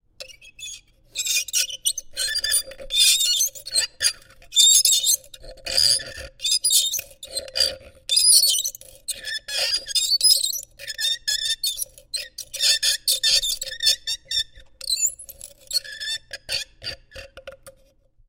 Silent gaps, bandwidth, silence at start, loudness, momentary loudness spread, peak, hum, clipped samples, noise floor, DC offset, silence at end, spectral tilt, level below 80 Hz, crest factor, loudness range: none; 16.5 kHz; 0.2 s; -19 LUFS; 19 LU; 0 dBFS; none; under 0.1%; -57 dBFS; under 0.1%; 0.6 s; 3 dB/octave; -52 dBFS; 24 dB; 7 LU